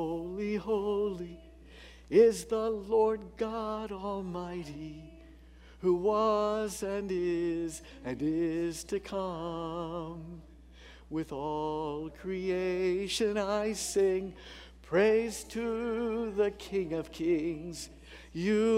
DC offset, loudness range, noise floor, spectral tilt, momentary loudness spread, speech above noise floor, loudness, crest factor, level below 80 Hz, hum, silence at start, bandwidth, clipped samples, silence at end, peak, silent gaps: under 0.1%; 6 LU; -54 dBFS; -5 dB/octave; 16 LU; 22 dB; -32 LUFS; 20 dB; -54 dBFS; none; 0 s; 15.5 kHz; under 0.1%; 0 s; -12 dBFS; none